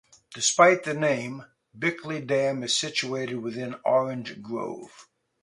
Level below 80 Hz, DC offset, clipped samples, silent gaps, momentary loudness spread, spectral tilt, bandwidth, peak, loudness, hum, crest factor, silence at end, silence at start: -72 dBFS; under 0.1%; under 0.1%; none; 17 LU; -3 dB/octave; 11.5 kHz; -4 dBFS; -25 LUFS; none; 22 dB; 0.4 s; 0.3 s